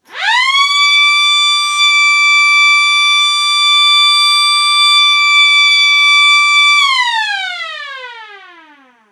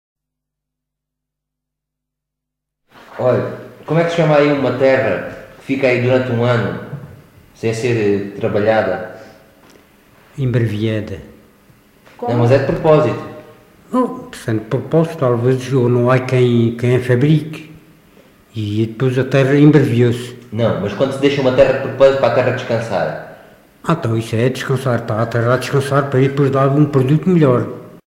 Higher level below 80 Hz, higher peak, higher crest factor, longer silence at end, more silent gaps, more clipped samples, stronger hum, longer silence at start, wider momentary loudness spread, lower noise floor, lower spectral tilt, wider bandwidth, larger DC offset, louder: second, under -90 dBFS vs -48 dBFS; about the same, -2 dBFS vs 0 dBFS; second, 10 dB vs 16 dB; first, 0.75 s vs 0.1 s; neither; neither; neither; second, 0.1 s vs 3.1 s; second, 9 LU vs 14 LU; second, -44 dBFS vs -80 dBFS; second, 6 dB/octave vs -7.5 dB/octave; about the same, 15.5 kHz vs 15 kHz; neither; first, -7 LUFS vs -15 LUFS